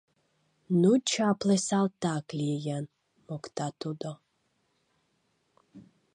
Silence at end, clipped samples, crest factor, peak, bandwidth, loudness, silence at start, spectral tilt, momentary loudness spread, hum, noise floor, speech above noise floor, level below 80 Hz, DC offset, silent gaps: 0.3 s; under 0.1%; 18 dB; -12 dBFS; 11.5 kHz; -29 LUFS; 0.7 s; -5.5 dB/octave; 17 LU; none; -75 dBFS; 47 dB; -74 dBFS; under 0.1%; none